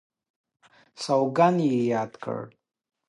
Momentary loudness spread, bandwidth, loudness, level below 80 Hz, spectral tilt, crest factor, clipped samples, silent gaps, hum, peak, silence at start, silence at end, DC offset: 15 LU; 11.5 kHz; -25 LUFS; -76 dBFS; -6.5 dB/octave; 20 dB; under 0.1%; none; none; -6 dBFS; 1 s; 0.6 s; under 0.1%